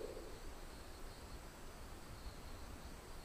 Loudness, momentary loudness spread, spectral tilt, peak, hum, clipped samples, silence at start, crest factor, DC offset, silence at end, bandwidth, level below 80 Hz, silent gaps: -54 LUFS; 2 LU; -4.5 dB/octave; -36 dBFS; none; under 0.1%; 0 s; 16 dB; under 0.1%; 0 s; 15.5 kHz; -54 dBFS; none